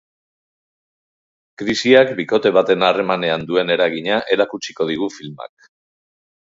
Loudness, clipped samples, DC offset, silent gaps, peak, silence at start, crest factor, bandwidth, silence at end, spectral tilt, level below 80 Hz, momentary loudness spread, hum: -17 LUFS; under 0.1%; under 0.1%; none; 0 dBFS; 1.6 s; 20 dB; 7.8 kHz; 1.1 s; -4.5 dB/octave; -60 dBFS; 14 LU; none